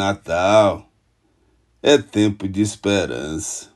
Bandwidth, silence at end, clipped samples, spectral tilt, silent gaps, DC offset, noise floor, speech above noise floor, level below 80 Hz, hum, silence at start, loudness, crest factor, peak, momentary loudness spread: 12.5 kHz; 0.1 s; under 0.1%; -4.5 dB/octave; none; under 0.1%; -63 dBFS; 44 dB; -50 dBFS; none; 0 s; -19 LUFS; 20 dB; 0 dBFS; 11 LU